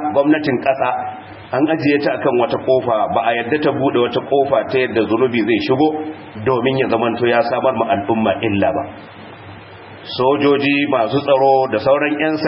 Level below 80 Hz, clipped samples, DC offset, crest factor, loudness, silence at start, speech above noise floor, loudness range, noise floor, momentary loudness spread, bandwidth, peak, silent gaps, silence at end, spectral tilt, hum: -56 dBFS; under 0.1%; under 0.1%; 16 dB; -16 LUFS; 0 s; 21 dB; 2 LU; -36 dBFS; 14 LU; 5.8 kHz; -2 dBFS; none; 0 s; -11 dB/octave; none